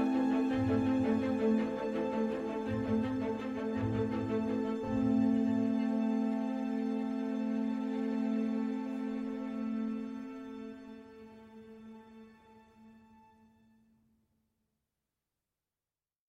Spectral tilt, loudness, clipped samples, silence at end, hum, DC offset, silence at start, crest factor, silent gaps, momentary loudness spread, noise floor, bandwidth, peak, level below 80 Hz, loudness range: -8 dB/octave; -34 LUFS; under 0.1%; 3.35 s; none; under 0.1%; 0 s; 14 dB; none; 19 LU; under -90 dBFS; 7.6 kHz; -20 dBFS; -64 dBFS; 13 LU